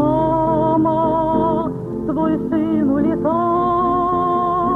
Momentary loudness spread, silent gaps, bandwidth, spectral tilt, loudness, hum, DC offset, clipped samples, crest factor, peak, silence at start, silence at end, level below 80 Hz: 4 LU; none; 4.2 kHz; -10 dB/octave; -18 LUFS; 50 Hz at -40 dBFS; under 0.1%; under 0.1%; 12 dB; -6 dBFS; 0 s; 0 s; -40 dBFS